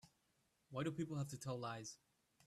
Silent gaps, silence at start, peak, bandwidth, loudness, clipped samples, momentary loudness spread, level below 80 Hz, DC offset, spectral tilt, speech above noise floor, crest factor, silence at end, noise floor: none; 0.05 s; -30 dBFS; 13.5 kHz; -47 LUFS; under 0.1%; 9 LU; -78 dBFS; under 0.1%; -5.5 dB/octave; 36 dB; 18 dB; 0.5 s; -82 dBFS